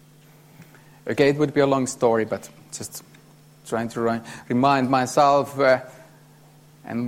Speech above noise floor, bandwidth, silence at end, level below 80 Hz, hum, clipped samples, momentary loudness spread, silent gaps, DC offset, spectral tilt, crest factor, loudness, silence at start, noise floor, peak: 30 dB; 16 kHz; 0 s; -62 dBFS; none; under 0.1%; 17 LU; none; under 0.1%; -5.5 dB/octave; 18 dB; -21 LUFS; 0.6 s; -51 dBFS; -6 dBFS